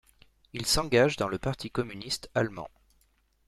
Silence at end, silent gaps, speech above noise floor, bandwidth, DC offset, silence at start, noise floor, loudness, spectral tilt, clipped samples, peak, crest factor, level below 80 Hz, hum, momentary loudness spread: 0.8 s; none; 40 dB; 14.5 kHz; under 0.1%; 0.55 s; -68 dBFS; -29 LUFS; -4 dB/octave; under 0.1%; -10 dBFS; 20 dB; -48 dBFS; none; 15 LU